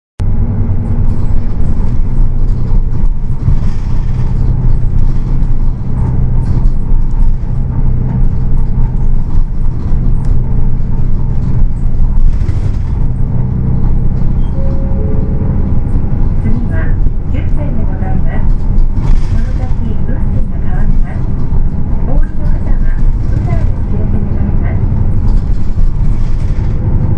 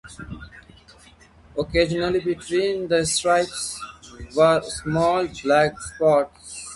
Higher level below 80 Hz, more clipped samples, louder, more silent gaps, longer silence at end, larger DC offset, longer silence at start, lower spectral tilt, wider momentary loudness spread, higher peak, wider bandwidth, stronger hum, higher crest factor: first, -10 dBFS vs -46 dBFS; first, 0.2% vs under 0.1%; first, -16 LUFS vs -21 LUFS; neither; about the same, 0 s vs 0 s; neither; first, 0.2 s vs 0.05 s; first, -10 dB/octave vs -4 dB/octave; second, 3 LU vs 18 LU; first, 0 dBFS vs -6 dBFS; second, 2.4 kHz vs 11.5 kHz; neither; second, 8 dB vs 18 dB